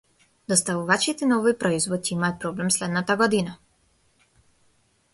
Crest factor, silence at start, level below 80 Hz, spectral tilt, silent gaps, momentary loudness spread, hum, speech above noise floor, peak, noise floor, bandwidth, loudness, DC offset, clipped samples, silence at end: 20 dB; 0.5 s; -62 dBFS; -3.5 dB/octave; none; 5 LU; none; 41 dB; -4 dBFS; -64 dBFS; 12 kHz; -23 LUFS; under 0.1%; under 0.1%; 1.6 s